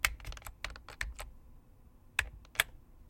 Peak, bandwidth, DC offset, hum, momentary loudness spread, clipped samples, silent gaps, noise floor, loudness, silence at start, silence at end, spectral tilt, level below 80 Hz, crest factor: -8 dBFS; 16.5 kHz; under 0.1%; none; 14 LU; under 0.1%; none; -59 dBFS; -38 LUFS; 0 s; 0 s; -0.5 dB/octave; -50 dBFS; 32 dB